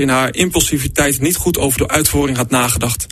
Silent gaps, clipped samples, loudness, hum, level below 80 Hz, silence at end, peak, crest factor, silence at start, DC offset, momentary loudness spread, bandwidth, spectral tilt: none; under 0.1%; -14 LUFS; none; -30 dBFS; 0.05 s; 0 dBFS; 16 dB; 0 s; under 0.1%; 2 LU; 13.5 kHz; -3.5 dB/octave